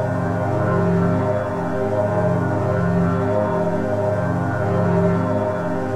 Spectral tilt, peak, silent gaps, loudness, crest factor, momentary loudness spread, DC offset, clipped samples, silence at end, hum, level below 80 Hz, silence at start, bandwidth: -9 dB/octave; -6 dBFS; none; -20 LUFS; 12 dB; 3 LU; under 0.1%; under 0.1%; 0 s; none; -44 dBFS; 0 s; 9 kHz